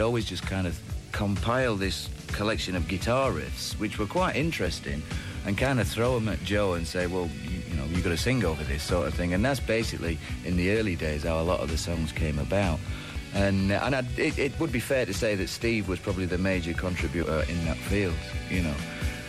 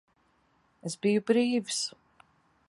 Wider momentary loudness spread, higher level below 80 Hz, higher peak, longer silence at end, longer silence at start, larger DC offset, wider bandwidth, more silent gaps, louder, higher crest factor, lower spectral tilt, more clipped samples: second, 7 LU vs 13 LU; first, -38 dBFS vs -78 dBFS; about the same, -12 dBFS vs -12 dBFS; second, 0 s vs 0.8 s; second, 0 s vs 0.85 s; neither; first, 15.5 kHz vs 11.5 kHz; neither; about the same, -28 LUFS vs -29 LUFS; about the same, 16 dB vs 20 dB; first, -5.5 dB/octave vs -4 dB/octave; neither